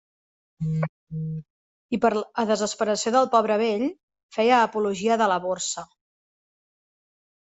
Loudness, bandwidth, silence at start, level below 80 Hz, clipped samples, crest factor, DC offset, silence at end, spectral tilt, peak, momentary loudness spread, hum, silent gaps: -24 LUFS; 8.2 kHz; 0.6 s; -64 dBFS; under 0.1%; 20 dB; under 0.1%; 1.75 s; -4.5 dB/octave; -6 dBFS; 13 LU; none; 0.89-1.07 s, 1.50-1.89 s, 4.03-4.08 s, 4.23-4.29 s